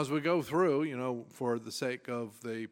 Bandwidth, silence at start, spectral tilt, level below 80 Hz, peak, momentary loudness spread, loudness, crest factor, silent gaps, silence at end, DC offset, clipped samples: 17 kHz; 0 s; -5.5 dB/octave; -76 dBFS; -16 dBFS; 10 LU; -33 LUFS; 16 dB; none; 0.05 s; under 0.1%; under 0.1%